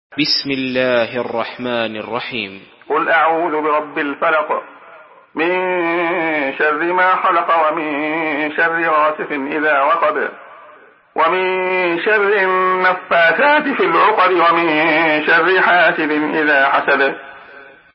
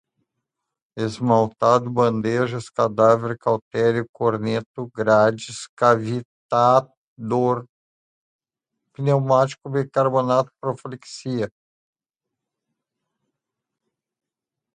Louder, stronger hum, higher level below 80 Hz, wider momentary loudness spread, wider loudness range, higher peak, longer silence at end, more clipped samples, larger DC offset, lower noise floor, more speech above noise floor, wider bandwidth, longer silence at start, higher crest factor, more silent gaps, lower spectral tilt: first, -15 LUFS vs -21 LUFS; neither; about the same, -64 dBFS vs -62 dBFS; about the same, 10 LU vs 12 LU; second, 5 LU vs 8 LU; about the same, 0 dBFS vs -2 dBFS; second, 0.3 s vs 3.25 s; neither; neither; second, -45 dBFS vs -86 dBFS; second, 29 dB vs 66 dB; second, 5.8 kHz vs 10.5 kHz; second, 0.1 s vs 0.95 s; about the same, 16 dB vs 20 dB; second, none vs 3.62-3.71 s, 4.09-4.14 s, 4.66-4.74 s, 5.69-5.77 s, 6.25-6.49 s, 6.97-7.16 s, 7.69-8.39 s; first, -8 dB/octave vs -6.5 dB/octave